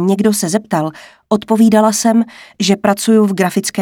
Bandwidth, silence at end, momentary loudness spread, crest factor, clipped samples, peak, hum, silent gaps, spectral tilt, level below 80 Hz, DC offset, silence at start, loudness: 17.5 kHz; 0 s; 8 LU; 12 dB; under 0.1%; 0 dBFS; none; none; -5 dB/octave; -56 dBFS; under 0.1%; 0 s; -14 LUFS